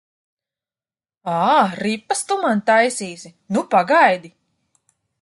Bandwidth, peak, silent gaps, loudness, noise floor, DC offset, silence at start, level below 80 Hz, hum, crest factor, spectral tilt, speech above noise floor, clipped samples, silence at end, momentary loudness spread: 11.5 kHz; -2 dBFS; none; -18 LUFS; under -90 dBFS; under 0.1%; 1.25 s; -70 dBFS; none; 18 dB; -4 dB/octave; over 72 dB; under 0.1%; 0.95 s; 13 LU